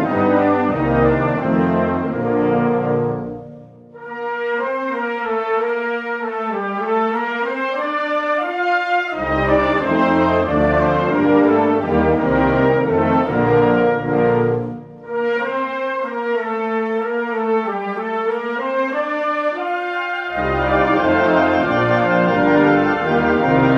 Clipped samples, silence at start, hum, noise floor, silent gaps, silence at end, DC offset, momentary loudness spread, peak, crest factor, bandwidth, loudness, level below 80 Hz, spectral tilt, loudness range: under 0.1%; 0 s; none; -39 dBFS; none; 0 s; under 0.1%; 7 LU; -2 dBFS; 14 dB; 7 kHz; -18 LUFS; -40 dBFS; -8 dB/octave; 6 LU